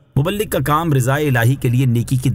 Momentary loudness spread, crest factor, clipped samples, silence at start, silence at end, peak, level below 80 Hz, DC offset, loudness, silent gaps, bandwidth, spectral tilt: 3 LU; 12 dB; under 0.1%; 0.15 s; 0 s; -4 dBFS; -38 dBFS; under 0.1%; -17 LUFS; none; 16.5 kHz; -6.5 dB/octave